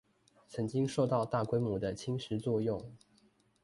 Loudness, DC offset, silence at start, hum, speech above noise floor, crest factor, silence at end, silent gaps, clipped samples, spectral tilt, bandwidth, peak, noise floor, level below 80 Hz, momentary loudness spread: -34 LUFS; under 0.1%; 0.5 s; none; 35 dB; 18 dB; 0.65 s; none; under 0.1%; -7 dB/octave; 11.5 kHz; -18 dBFS; -69 dBFS; -64 dBFS; 9 LU